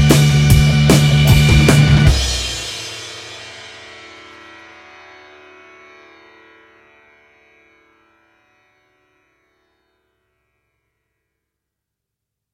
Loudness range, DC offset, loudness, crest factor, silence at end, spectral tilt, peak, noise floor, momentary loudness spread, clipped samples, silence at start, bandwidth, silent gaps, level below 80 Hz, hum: 27 LU; under 0.1%; -12 LUFS; 18 dB; 8.85 s; -5 dB/octave; 0 dBFS; -81 dBFS; 25 LU; under 0.1%; 0 s; 16.5 kHz; none; -26 dBFS; 50 Hz at -45 dBFS